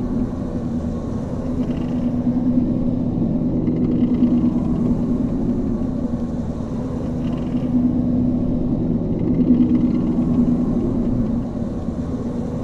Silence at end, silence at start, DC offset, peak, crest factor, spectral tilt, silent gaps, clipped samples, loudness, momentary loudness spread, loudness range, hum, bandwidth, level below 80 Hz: 0 s; 0 s; under 0.1%; -4 dBFS; 14 dB; -10 dB/octave; none; under 0.1%; -20 LUFS; 8 LU; 3 LU; none; 6.6 kHz; -32 dBFS